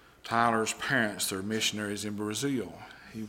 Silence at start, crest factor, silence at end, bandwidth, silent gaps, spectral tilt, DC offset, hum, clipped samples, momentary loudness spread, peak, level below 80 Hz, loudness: 0.25 s; 20 dB; 0 s; 17 kHz; none; -3 dB/octave; under 0.1%; none; under 0.1%; 10 LU; -10 dBFS; -64 dBFS; -30 LUFS